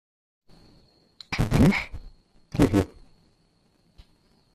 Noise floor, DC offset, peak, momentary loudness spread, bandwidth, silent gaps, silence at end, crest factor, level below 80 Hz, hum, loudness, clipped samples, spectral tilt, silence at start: -65 dBFS; under 0.1%; -6 dBFS; 16 LU; 14 kHz; none; 1.7 s; 22 dB; -40 dBFS; none; -24 LUFS; under 0.1%; -7 dB/octave; 1.3 s